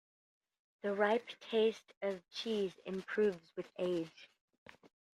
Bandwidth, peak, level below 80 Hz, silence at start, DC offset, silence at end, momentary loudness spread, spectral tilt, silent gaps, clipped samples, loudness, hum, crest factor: 11 kHz; -18 dBFS; -82 dBFS; 0.85 s; under 0.1%; 0.9 s; 10 LU; -5.5 dB/octave; 1.97-2.01 s; under 0.1%; -38 LUFS; none; 22 dB